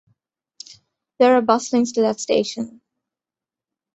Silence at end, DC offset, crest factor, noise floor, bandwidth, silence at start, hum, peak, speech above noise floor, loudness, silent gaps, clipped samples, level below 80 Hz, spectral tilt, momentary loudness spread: 1.25 s; under 0.1%; 20 dB; -89 dBFS; 8.2 kHz; 1.2 s; none; -2 dBFS; 71 dB; -18 LUFS; none; under 0.1%; -66 dBFS; -4 dB/octave; 24 LU